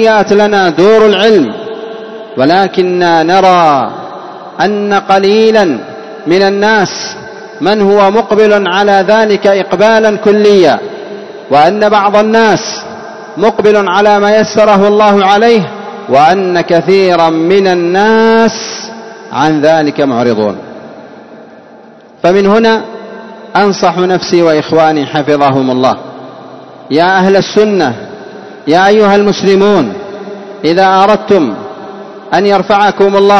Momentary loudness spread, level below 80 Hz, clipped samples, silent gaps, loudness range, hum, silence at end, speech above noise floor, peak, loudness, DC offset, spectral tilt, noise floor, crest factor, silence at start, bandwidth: 18 LU; -48 dBFS; 2%; none; 4 LU; none; 0 s; 28 dB; 0 dBFS; -8 LUFS; under 0.1%; -5.5 dB/octave; -35 dBFS; 8 dB; 0 s; 8.2 kHz